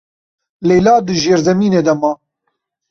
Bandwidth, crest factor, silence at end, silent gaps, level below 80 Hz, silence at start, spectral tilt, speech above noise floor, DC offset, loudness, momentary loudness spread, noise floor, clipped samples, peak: 7.4 kHz; 14 dB; 0.75 s; none; -48 dBFS; 0.6 s; -5.5 dB/octave; 59 dB; under 0.1%; -13 LUFS; 9 LU; -71 dBFS; under 0.1%; 0 dBFS